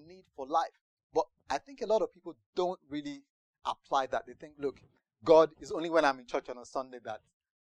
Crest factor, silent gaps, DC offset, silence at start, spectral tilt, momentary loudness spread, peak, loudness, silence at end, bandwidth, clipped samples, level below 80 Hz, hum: 22 dB; 0.81-0.97 s, 1.03-1.10 s, 2.46-2.53 s, 3.30-3.54 s; under 0.1%; 0.1 s; -4.5 dB/octave; 18 LU; -10 dBFS; -32 LUFS; 0.45 s; 9.8 kHz; under 0.1%; -66 dBFS; none